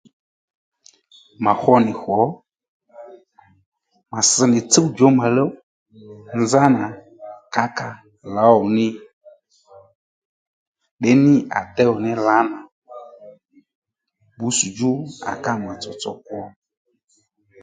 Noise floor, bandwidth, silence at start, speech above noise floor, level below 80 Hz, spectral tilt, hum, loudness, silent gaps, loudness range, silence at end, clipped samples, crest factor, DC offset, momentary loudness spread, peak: -65 dBFS; 9.6 kHz; 1.4 s; 48 dB; -60 dBFS; -4.5 dB/octave; none; -18 LUFS; 2.68-2.80 s, 3.66-3.72 s, 5.63-5.86 s, 9.13-9.21 s, 9.95-10.75 s, 10.91-10.97 s, 12.72-12.82 s, 13.75-13.82 s; 7 LU; 1.15 s; under 0.1%; 20 dB; under 0.1%; 19 LU; 0 dBFS